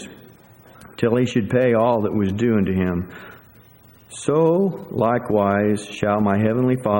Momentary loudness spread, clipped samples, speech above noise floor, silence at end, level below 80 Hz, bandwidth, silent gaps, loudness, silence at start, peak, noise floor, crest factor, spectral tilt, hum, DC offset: 9 LU; under 0.1%; 30 dB; 0 s; -52 dBFS; 16.5 kHz; none; -20 LUFS; 0 s; -4 dBFS; -49 dBFS; 16 dB; -7.5 dB/octave; none; under 0.1%